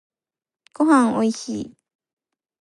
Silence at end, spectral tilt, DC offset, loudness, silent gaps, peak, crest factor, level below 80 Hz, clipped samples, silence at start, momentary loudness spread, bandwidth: 0.95 s; -5 dB/octave; under 0.1%; -19 LUFS; none; -6 dBFS; 18 dB; -66 dBFS; under 0.1%; 0.8 s; 15 LU; 11.5 kHz